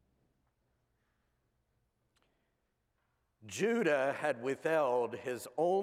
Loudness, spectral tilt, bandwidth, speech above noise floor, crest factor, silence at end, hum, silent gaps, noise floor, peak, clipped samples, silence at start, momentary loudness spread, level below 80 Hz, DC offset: -34 LUFS; -5 dB/octave; 16 kHz; 48 dB; 18 dB; 0 s; none; none; -81 dBFS; -18 dBFS; under 0.1%; 3.45 s; 9 LU; -84 dBFS; under 0.1%